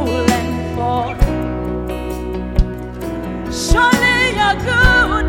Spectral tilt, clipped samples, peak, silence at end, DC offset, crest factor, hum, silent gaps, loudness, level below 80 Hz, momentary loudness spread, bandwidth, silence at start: -4.5 dB/octave; under 0.1%; 0 dBFS; 0 s; under 0.1%; 16 dB; none; none; -16 LUFS; -22 dBFS; 12 LU; 17 kHz; 0 s